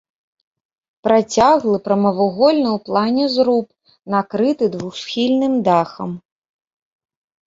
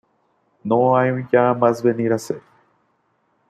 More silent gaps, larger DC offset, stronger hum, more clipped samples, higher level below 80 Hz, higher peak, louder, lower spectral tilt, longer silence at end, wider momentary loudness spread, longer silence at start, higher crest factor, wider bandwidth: neither; neither; neither; neither; first, -56 dBFS vs -64 dBFS; about the same, -2 dBFS vs -2 dBFS; about the same, -17 LUFS vs -18 LUFS; second, -5.5 dB/octave vs -7.5 dB/octave; first, 1.25 s vs 1.1 s; second, 11 LU vs 15 LU; first, 1.05 s vs 0.65 s; about the same, 16 dB vs 18 dB; second, 7.8 kHz vs 14 kHz